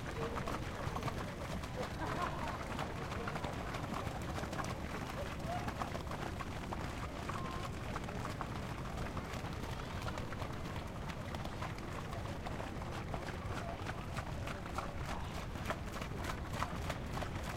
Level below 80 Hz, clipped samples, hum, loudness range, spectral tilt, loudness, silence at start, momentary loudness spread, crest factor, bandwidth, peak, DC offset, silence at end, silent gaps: -50 dBFS; under 0.1%; none; 2 LU; -5.5 dB/octave; -42 LUFS; 0 s; 3 LU; 22 dB; 16.5 kHz; -18 dBFS; under 0.1%; 0 s; none